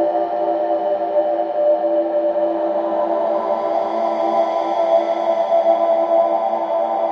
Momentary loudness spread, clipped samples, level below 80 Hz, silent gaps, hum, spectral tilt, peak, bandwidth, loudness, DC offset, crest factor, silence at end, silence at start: 4 LU; under 0.1%; -70 dBFS; none; none; -6 dB/octave; -4 dBFS; 6.6 kHz; -18 LUFS; under 0.1%; 14 dB; 0 s; 0 s